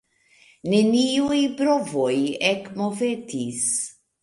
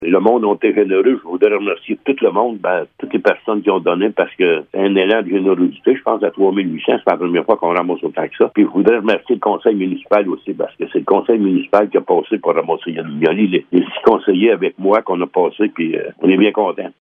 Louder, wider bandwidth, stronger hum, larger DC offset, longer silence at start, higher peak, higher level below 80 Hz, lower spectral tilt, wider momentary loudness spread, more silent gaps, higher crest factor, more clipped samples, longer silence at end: second, -22 LUFS vs -15 LUFS; first, 11.5 kHz vs 4.7 kHz; neither; neither; first, 0.65 s vs 0 s; second, -6 dBFS vs 0 dBFS; about the same, -64 dBFS vs -64 dBFS; second, -3.5 dB/octave vs -8.5 dB/octave; about the same, 9 LU vs 7 LU; neither; about the same, 18 dB vs 14 dB; neither; first, 0.3 s vs 0.1 s